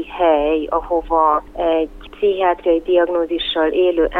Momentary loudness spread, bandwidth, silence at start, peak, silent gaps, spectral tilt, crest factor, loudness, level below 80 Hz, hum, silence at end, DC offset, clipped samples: 4 LU; 4.3 kHz; 0 s; -2 dBFS; none; -6.5 dB/octave; 14 dB; -17 LUFS; -40 dBFS; 50 Hz at -55 dBFS; 0 s; under 0.1%; under 0.1%